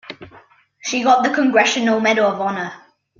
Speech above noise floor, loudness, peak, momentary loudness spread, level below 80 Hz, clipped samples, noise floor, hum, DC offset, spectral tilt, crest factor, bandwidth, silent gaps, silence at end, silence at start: 32 dB; -16 LUFS; -2 dBFS; 15 LU; -64 dBFS; under 0.1%; -49 dBFS; none; under 0.1%; -3.5 dB/octave; 16 dB; 7.6 kHz; none; 0.45 s; 0.1 s